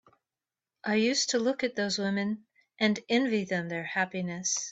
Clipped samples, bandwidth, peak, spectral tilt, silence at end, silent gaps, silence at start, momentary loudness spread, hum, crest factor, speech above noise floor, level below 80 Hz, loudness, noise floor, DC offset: under 0.1%; 8.4 kHz; -12 dBFS; -3.5 dB/octave; 0 s; none; 0.85 s; 6 LU; none; 20 dB; over 61 dB; -74 dBFS; -29 LUFS; under -90 dBFS; under 0.1%